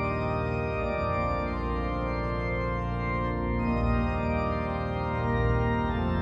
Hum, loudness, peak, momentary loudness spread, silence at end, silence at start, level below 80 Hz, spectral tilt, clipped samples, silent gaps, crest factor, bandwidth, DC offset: none; -29 LUFS; -14 dBFS; 4 LU; 0 s; 0 s; -34 dBFS; -9 dB/octave; under 0.1%; none; 12 dB; 7.4 kHz; under 0.1%